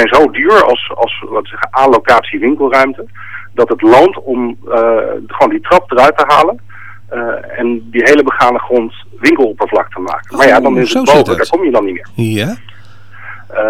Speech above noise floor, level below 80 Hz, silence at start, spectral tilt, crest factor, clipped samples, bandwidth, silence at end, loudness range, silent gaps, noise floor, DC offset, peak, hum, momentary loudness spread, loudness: 27 dB; -44 dBFS; 0 s; -5 dB/octave; 10 dB; under 0.1%; 16.5 kHz; 0 s; 2 LU; none; -37 dBFS; 3%; 0 dBFS; none; 13 LU; -10 LUFS